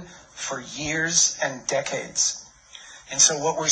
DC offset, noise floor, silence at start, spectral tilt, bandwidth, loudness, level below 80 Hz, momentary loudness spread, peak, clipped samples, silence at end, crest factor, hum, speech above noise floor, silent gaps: under 0.1%; -46 dBFS; 0 s; -0.5 dB/octave; 9 kHz; -22 LUFS; -58 dBFS; 19 LU; -4 dBFS; under 0.1%; 0 s; 22 dB; none; 23 dB; none